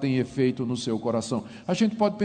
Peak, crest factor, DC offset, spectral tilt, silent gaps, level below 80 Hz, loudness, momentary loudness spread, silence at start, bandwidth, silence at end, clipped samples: -10 dBFS; 16 dB; under 0.1%; -6 dB/octave; none; -62 dBFS; -27 LUFS; 7 LU; 0 s; 9.4 kHz; 0 s; under 0.1%